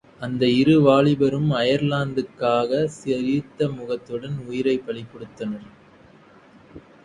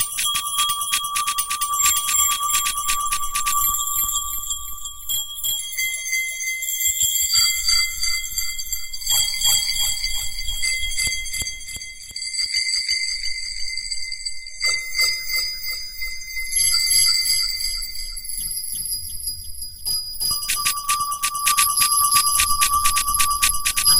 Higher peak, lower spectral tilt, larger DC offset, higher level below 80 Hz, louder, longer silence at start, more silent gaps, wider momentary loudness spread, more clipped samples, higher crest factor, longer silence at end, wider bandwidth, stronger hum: about the same, -4 dBFS vs -2 dBFS; first, -7 dB/octave vs 2.5 dB/octave; second, under 0.1% vs 1%; second, -56 dBFS vs -38 dBFS; about the same, -21 LUFS vs -19 LUFS; first, 0.2 s vs 0 s; neither; first, 15 LU vs 11 LU; neither; about the same, 18 dB vs 20 dB; first, 0.25 s vs 0 s; second, 10 kHz vs 17 kHz; neither